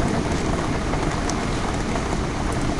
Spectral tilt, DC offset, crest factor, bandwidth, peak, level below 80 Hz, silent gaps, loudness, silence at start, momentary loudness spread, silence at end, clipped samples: -5.5 dB/octave; under 0.1%; 14 dB; 11.5 kHz; -8 dBFS; -30 dBFS; none; -24 LUFS; 0 s; 2 LU; 0 s; under 0.1%